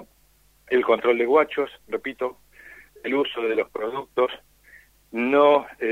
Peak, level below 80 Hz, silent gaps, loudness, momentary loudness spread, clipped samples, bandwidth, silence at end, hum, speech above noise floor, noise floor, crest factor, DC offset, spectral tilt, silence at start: -4 dBFS; -62 dBFS; none; -23 LUFS; 13 LU; under 0.1%; 15.5 kHz; 0 s; none; 37 dB; -60 dBFS; 20 dB; under 0.1%; -5.5 dB/octave; 0 s